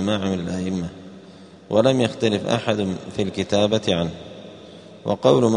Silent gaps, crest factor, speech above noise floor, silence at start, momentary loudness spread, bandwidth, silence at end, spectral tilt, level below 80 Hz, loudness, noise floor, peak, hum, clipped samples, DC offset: none; 20 dB; 24 dB; 0 s; 22 LU; 10.5 kHz; 0 s; -6 dB/octave; -54 dBFS; -22 LUFS; -44 dBFS; 0 dBFS; none; under 0.1%; under 0.1%